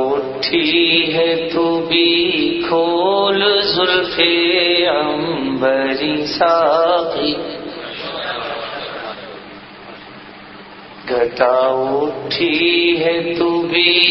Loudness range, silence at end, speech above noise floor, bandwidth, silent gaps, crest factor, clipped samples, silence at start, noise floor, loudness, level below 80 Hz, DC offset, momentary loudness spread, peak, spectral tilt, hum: 11 LU; 0 s; 21 dB; 6 kHz; none; 16 dB; under 0.1%; 0 s; -36 dBFS; -15 LUFS; -52 dBFS; under 0.1%; 20 LU; 0 dBFS; -6 dB/octave; none